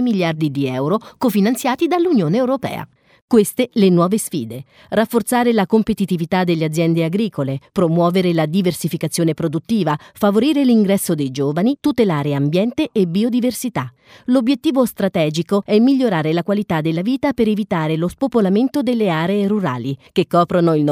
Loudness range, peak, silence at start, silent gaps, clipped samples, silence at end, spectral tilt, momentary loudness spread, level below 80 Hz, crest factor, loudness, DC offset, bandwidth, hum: 1 LU; -2 dBFS; 0 s; 3.22-3.28 s; under 0.1%; 0 s; -6.5 dB/octave; 7 LU; -54 dBFS; 16 dB; -17 LUFS; under 0.1%; 16 kHz; none